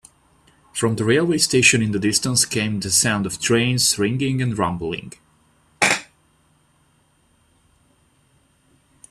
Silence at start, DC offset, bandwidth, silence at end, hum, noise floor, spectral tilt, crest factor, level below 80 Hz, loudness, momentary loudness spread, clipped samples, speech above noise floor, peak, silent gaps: 0.75 s; under 0.1%; 15.5 kHz; 3.05 s; none; -61 dBFS; -3.5 dB/octave; 22 dB; -54 dBFS; -18 LUFS; 9 LU; under 0.1%; 41 dB; -2 dBFS; none